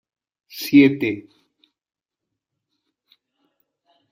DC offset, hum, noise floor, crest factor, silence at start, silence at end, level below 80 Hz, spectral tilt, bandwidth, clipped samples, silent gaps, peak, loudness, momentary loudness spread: under 0.1%; none; -83 dBFS; 22 dB; 0.55 s; 2.9 s; -66 dBFS; -6 dB/octave; 15.5 kHz; under 0.1%; none; -2 dBFS; -17 LUFS; 20 LU